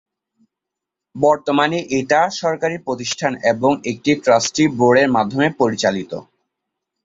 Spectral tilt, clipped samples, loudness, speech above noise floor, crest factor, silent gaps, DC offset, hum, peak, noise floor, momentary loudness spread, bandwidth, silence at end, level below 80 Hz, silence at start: -4.5 dB/octave; under 0.1%; -17 LUFS; 66 dB; 16 dB; none; under 0.1%; none; -2 dBFS; -83 dBFS; 8 LU; 7.8 kHz; 0.8 s; -58 dBFS; 1.15 s